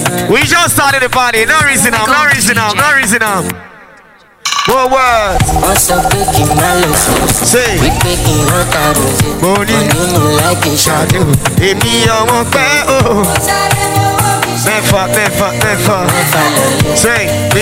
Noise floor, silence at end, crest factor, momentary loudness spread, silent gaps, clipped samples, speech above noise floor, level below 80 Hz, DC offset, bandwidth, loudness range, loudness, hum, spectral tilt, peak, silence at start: -41 dBFS; 0 s; 10 dB; 3 LU; none; under 0.1%; 31 dB; -26 dBFS; under 0.1%; 16.5 kHz; 2 LU; -9 LUFS; none; -3.5 dB/octave; 0 dBFS; 0 s